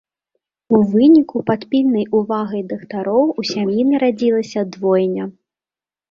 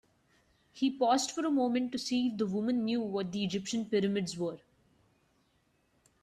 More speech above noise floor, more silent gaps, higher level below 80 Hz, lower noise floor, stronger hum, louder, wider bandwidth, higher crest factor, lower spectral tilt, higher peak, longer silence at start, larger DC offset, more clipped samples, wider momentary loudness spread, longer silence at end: first, over 74 dB vs 41 dB; neither; first, -60 dBFS vs -72 dBFS; first, under -90 dBFS vs -73 dBFS; neither; first, -17 LUFS vs -32 LUFS; second, 7.4 kHz vs 14 kHz; about the same, 16 dB vs 18 dB; first, -7 dB/octave vs -5 dB/octave; first, 0 dBFS vs -16 dBFS; about the same, 0.7 s vs 0.75 s; neither; neither; first, 12 LU vs 6 LU; second, 0.8 s vs 1.65 s